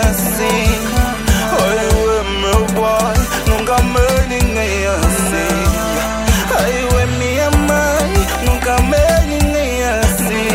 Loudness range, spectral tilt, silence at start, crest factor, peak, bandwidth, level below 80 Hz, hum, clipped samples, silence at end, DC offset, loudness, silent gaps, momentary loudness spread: 1 LU; -4.5 dB/octave; 0 s; 14 dB; 0 dBFS; 16.5 kHz; -20 dBFS; none; under 0.1%; 0 s; under 0.1%; -14 LUFS; none; 3 LU